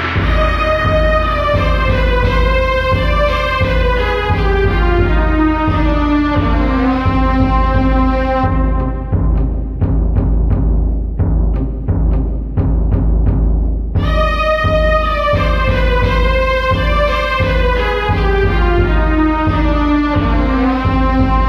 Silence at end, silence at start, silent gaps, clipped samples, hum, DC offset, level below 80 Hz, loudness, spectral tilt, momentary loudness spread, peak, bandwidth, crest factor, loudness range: 0 s; 0 s; none; under 0.1%; none; under 0.1%; -16 dBFS; -14 LUFS; -8 dB/octave; 4 LU; -2 dBFS; 6.2 kHz; 12 dB; 3 LU